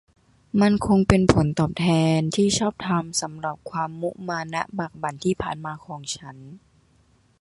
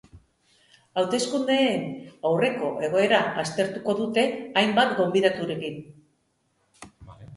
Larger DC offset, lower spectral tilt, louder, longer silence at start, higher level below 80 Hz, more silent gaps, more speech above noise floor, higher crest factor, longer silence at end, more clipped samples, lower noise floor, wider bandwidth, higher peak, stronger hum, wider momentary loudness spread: neither; about the same, -5.5 dB/octave vs -4.5 dB/octave; about the same, -23 LUFS vs -24 LUFS; first, 0.55 s vs 0.15 s; first, -44 dBFS vs -64 dBFS; neither; second, 38 dB vs 46 dB; about the same, 22 dB vs 20 dB; first, 0.85 s vs 0 s; neither; second, -60 dBFS vs -70 dBFS; about the same, 11.5 kHz vs 11.5 kHz; first, -2 dBFS vs -6 dBFS; neither; first, 14 LU vs 10 LU